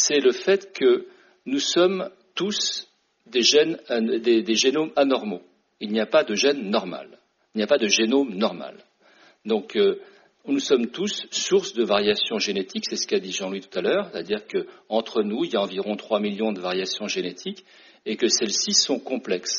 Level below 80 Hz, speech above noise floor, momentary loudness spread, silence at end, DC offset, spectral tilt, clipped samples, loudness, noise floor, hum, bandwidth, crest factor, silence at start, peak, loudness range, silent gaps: -70 dBFS; 33 dB; 13 LU; 0 s; under 0.1%; -2.5 dB/octave; under 0.1%; -23 LUFS; -56 dBFS; none; 7.4 kHz; 20 dB; 0 s; -4 dBFS; 4 LU; none